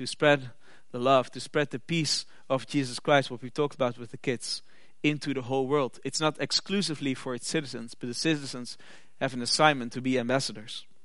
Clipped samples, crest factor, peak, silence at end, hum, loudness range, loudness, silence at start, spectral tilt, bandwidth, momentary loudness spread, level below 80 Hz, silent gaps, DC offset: under 0.1%; 24 dB; -6 dBFS; 0.25 s; none; 2 LU; -28 LUFS; 0 s; -4 dB/octave; 11.5 kHz; 12 LU; -72 dBFS; none; 0.5%